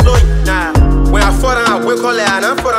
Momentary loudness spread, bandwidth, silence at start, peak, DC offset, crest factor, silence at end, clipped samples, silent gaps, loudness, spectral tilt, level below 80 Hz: 2 LU; 15 kHz; 0 s; 0 dBFS; under 0.1%; 10 dB; 0 s; under 0.1%; none; -12 LUFS; -5 dB/octave; -14 dBFS